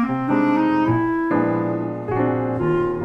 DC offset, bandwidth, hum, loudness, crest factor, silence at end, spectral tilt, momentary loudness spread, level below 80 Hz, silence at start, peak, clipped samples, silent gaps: under 0.1%; 6 kHz; none; -20 LUFS; 12 dB; 0 s; -9.5 dB/octave; 5 LU; -46 dBFS; 0 s; -8 dBFS; under 0.1%; none